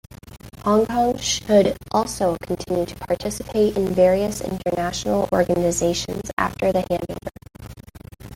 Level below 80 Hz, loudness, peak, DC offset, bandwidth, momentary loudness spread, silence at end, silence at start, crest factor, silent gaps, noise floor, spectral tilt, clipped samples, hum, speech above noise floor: -44 dBFS; -21 LUFS; -4 dBFS; under 0.1%; 17 kHz; 15 LU; 0 s; 0.1 s; 18 dB; 6.33-6.37 s; -40 dBFS; -4.5 dB/octave; under 0.1%; none; 19 dB